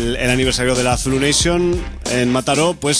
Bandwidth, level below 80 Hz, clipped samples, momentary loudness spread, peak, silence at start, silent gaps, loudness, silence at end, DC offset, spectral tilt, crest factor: 11 kHz; -30 dBFS; under 0.1%; 5 LU; -2 dBFS; 0 s; none; -16 LUFS; 0 s; under 0.1%; -3.5 dB/octave; 14 dB